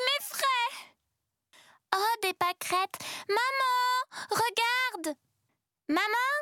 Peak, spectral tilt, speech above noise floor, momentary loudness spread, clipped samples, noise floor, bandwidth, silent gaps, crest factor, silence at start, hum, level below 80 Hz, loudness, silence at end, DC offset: -10 dBFS; -1 dB/octave; 55 dB; 11 LU; under 0.1%; -83 dBFS; 19 kHz; none; 22 dB; 0 s; none; -84 dBFS; -29 LUFS; 0 s; under 0.1%